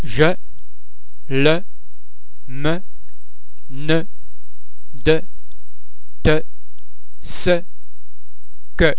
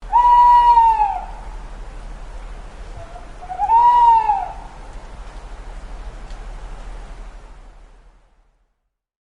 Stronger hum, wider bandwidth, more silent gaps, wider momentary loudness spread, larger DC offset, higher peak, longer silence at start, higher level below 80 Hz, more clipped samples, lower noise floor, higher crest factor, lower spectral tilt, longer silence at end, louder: neither; second, 4 kHz vs 9.4 kHz; neither; second, 19 LU vs 27 LU; first, 30% vs under 0.1%; first, 0 dBFS vs -4 dBFS; about the same, 0 s vs 0 s; about the same, -36 dBFS vs -34 dBFS; neither; second, -53 dBFS vs -72 dBFS; first, 24 dB vs 16 dB; first, -9.5 dB/octave vs -4.5 dB/octave; second, 0.05 s vs 1.7 s; second, -20 LUFS vs -13 LUFS